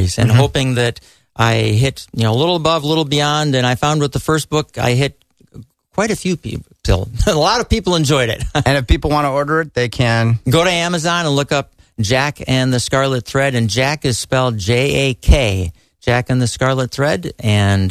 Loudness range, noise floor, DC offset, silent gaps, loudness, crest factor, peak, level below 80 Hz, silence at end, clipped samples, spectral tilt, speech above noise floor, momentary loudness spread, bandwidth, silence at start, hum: 3 LU; -40 dBFS; under 0.1%; none; -16 LUFS; 14 dB; 0 dBFS; -28 dBFS; 0 s; under 0.1%; -5 dB/octave; 25 dB; 6 LU; 14 kHz; 0 s; none